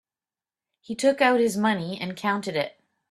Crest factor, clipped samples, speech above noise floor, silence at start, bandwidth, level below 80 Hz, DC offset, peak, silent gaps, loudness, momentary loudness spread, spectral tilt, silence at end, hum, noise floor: 20 dB; under 0.1%; over 66 dB; 0.9 s; 13.5 kHz; -70 dBFS; under 0.1%; -6 dBFS; none; -24 LUFS; 11 LU; -4.5 dB/octave; 0.45 s; none; under -90 dBFS